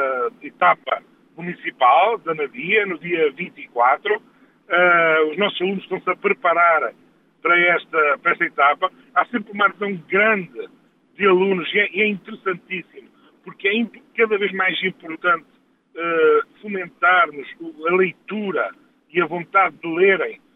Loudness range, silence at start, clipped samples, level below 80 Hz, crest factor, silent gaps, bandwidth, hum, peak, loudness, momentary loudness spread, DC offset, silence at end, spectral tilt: 4 LU; 0 s; under 0.1%; -74 dBFS; 18 dB; none; 4 kHz; none; -4 dBFS; -19 LUFS; 12 LU; under 0.1%; 0.2 s; -7.5 dB/octave